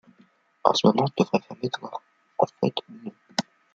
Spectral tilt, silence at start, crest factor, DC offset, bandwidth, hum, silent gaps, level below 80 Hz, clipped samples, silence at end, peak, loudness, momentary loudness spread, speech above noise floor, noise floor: -5.5 dB/octave; 0.65 s; 26 dB; under 0.1%; 9 kHz; none; none; -68 dBFS; under 0.1%; 0.35 s; 0 dBFS; -25 LUFS; 18 LU; 37 dB; -61 dBFS